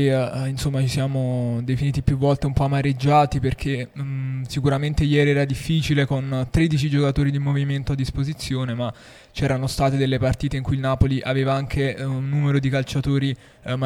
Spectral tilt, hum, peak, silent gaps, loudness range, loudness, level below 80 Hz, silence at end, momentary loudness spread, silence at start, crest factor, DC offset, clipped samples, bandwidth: -7 dB/octave; none; -4 dBFS; none; 3 LU; -22 LUFS; -36 dBFS; 0 s; 7 LU; 0 s; 18 dB; under 0.1%; under 0.1%; 13 kHz